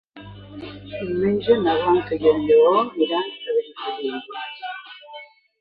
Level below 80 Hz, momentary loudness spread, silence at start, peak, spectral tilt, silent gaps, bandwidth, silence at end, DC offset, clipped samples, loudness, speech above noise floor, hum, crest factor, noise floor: -54 dBFS; 23 LU; 0.15 s; -4 dBFS; -9 dB/octave; none; 4.9 kHz; 0.35 s; under 0.1%; under 0.1%; -21 LUFS; 22 dB; none; 16 dB; -43 dBFS